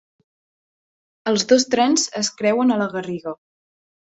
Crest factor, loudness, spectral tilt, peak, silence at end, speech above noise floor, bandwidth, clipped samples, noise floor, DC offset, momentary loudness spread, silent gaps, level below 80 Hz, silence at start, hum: 18 dB; -19 LUFS; -3 dB/octave; -4 dBFS; 0.8 s; over 71 dB; 8.4 kHz; under 0.1%; under -90 dBFS; under 0.1%; 13 LU; none; -66 dBFS; 1.25 s; none